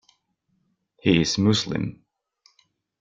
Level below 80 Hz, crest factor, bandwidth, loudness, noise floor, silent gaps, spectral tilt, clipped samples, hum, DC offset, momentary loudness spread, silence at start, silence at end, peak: -54 dBFS; 20 dB; 9.2 kHz; -22 LUFS; -72 dBFS; none; -5 dB/octave; under 0.1%; none; under 0.1%; 10 LU; 1.05 s; 1.1 s; -6 dBFS